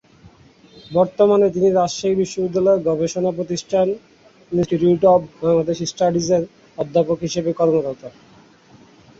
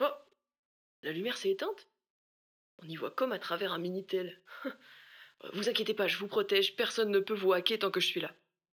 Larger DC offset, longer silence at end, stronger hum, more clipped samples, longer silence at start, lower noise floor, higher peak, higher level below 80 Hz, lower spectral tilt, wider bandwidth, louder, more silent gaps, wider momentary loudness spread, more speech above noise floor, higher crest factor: neither; first, 1.1 s vs 0.4 s; neither; neither; first, 0.25 s vs 0 s; second, -49 dBFS vs under -90 dBFS; first, -2 dBFS vs -12 dBFS; first, -54 dBFS vs under -90 dBFS; first, -6 dB/octave vs -3.5 dB/octave; second, 8 kHz vs 19.5 kHz; first, -19 LUFS vs -33 LUFS; second, none vs 0.59-1.03 s, 2.10-2.78 s; second, 8 LU vs 15 LU; second, 31 dB vs over 57 dB; second, 16 dB vs 22 dB